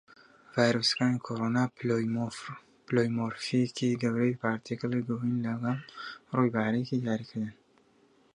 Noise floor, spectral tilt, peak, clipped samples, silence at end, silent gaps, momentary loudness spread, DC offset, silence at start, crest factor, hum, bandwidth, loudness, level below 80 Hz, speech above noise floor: -64 dBFS; -6 dB/octave; -10 dBFS; under 0.1%; 0.85 s; none; 11 LU; under 0.1%; 0.55 s; 22 dB; none; 11 kHz; -30 LUFS; -70 dBFS; 35 dB